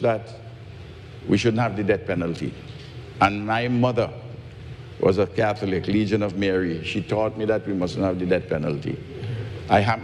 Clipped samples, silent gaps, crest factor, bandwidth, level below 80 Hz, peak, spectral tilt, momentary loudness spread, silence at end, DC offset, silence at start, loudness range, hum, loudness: under 0.1%; none; 20 dB; 11 kHz; -50 dBFS; -4 dBFS; -7 dB/octave; 18 LU; 0 s; under 0.1%; 0 s; 2 LU; none; -24 LUFS